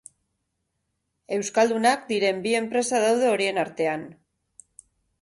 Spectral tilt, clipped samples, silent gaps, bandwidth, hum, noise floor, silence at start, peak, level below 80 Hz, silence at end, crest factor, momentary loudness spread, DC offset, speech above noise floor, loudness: -3.5 dB/octave; under 0.1%; none; 11.5 kHz; none; -77 dBFS; 1.3 s; -8 dBFS; -70 dBFS; 1.1 s; 18 dB; 9 LU; under 0.1%; 54 dB; -23 LUFS